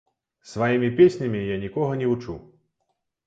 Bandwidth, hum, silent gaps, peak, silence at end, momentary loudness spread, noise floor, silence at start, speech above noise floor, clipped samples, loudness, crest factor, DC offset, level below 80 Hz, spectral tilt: 7.8 kHz; none; none; -6 dBFS; 0.85 s; 18 LU; -76 dBFS; 0.45 s; 54 dB; under 0.1%; -22 LUFS; 18 dB; under 0.1%; -54 dBFS; -7.5 dB/octave